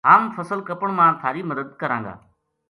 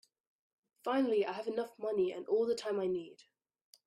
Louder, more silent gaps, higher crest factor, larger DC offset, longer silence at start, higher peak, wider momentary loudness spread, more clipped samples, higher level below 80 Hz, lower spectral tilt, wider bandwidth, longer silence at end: first, -21 LUFS vs -35 LUFS; neither; first, 22 dB vs 16 dB; neither; second, 0.05 s vs 0.85 s; first, 0 dBFS vs -22 dBFS; first, 12 LU vs 8 LU; neither; first, -64 dBFS vs -80 dBFS; first, -7.5 dB/octave vs -5.5 dB/octave; about the same, 11.5 kHz vs 12.5 kHz; second, 0.55 s vs 0.75 s